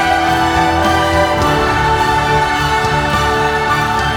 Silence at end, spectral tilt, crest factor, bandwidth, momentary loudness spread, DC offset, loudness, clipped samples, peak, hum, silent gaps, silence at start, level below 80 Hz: 0 s; -4.5 dB/octave; 12 dB; 20 kHz; 1 LU; under 0.1%; -13 LUFS; under 0.1%; 0 dBFS; none; none; 0 s; -28 dBFS